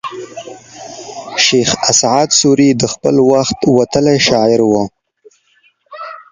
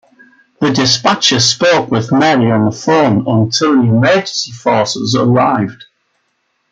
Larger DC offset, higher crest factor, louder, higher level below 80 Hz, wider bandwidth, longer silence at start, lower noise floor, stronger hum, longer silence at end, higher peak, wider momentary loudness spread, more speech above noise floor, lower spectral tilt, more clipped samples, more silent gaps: neither; about the same, 14 dB vs 12 dB; about the same, -11 LUFS vs -12 LUFS; first, -46 dBFS vs -52 dBFS; about the same, 10 kHz vs 9.2 kHz; second, 0.05 s vs 0.6 s; second, -55 dBFS vs -64 dBFS; neither; second, 0.15 s vs 0.9 s; about the same, 0 dBFS vs 0 dBFS; first, 20 LU vs 5 LU; second, 44 dB vs 52 dB; about the same, -3.5 dB/octave vs -4.5 dB/octave; neither; neither